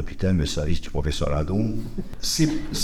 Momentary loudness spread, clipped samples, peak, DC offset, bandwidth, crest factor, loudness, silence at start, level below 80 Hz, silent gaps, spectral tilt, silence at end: 6 LU; under 0.1%; -8 dBFS; under 0.1%; 15.5 kHz; 16 dB; -25 LUFS; 0 s; -32 dBFS; none; -5 dB/octave; 0 s